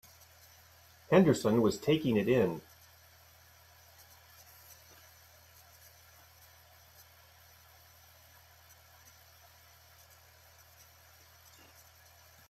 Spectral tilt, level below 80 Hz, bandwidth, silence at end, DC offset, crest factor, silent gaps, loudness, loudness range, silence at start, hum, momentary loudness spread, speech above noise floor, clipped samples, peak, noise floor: -6.5 dB/octave; -70 dBFS; 16 kHz; 9.9 s; under 0.1%; 24 dB; none; -29 LUFS; 27 LU; 1.1 s; none; 30 LU; 33 dB; under 0.1%; -12 dBFS; -60 dBFS